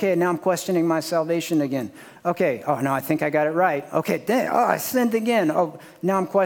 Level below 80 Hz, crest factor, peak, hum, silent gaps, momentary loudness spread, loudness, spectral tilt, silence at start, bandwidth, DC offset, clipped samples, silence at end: -72 dBFS; 18 dB; -4 dBFS; none; none; 6 LU; -22 LUFS; -5.5 dB/octave; 0 s; 18 kHz; under 0.1%; under 0.1%; 0 s